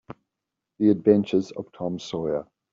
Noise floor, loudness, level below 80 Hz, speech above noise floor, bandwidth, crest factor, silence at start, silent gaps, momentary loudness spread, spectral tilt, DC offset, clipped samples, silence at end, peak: -85 dBFS; -24 LUFS; -64 dBFS; 62 dB; 7.6 kHz; 20 dB; 0.1 s; none; 12 LU; -7.5 dB/octave; under 0.1%; under 0.1%; 0.3 s; -4 dBFS